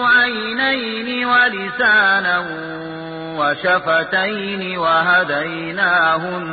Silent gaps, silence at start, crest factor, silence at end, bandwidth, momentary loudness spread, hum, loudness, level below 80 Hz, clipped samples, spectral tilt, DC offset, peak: none; 0 s; 16 dB; 0 s; 4.8 kHz; 13 LU; none; -16 LUFS; -56 dBFS; under 0.1%; -9 dB/octave; under 0.1%; -2 dBFS